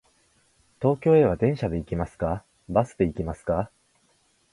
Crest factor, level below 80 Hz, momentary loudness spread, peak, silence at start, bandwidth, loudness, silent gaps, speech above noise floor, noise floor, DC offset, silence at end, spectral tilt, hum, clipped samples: 20 dB; -44 dBFS; 12 LU; -6 dBFS; 0.8 s; 11.5 kHz; -25 LUFS; none; 42 dB; -65 dBFS; under 0.1%; 0.85 s; -9 dB/octave; none; under 0.1%